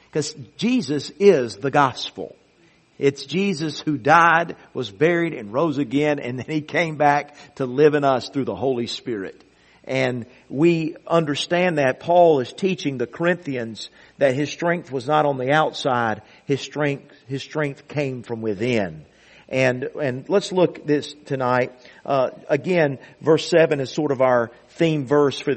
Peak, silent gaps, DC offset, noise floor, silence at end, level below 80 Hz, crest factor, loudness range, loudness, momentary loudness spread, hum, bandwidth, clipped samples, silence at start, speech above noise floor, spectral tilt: 0 dBFS; none; under 0.1%; -57 dBFS; 0 s; -62 dBFS; 20 dB; 4 LU; -21 LUFS; 13 LU; none; 8.8 kHz; under 0.1%; 0.15 s; 36 dB; -6 dB/octave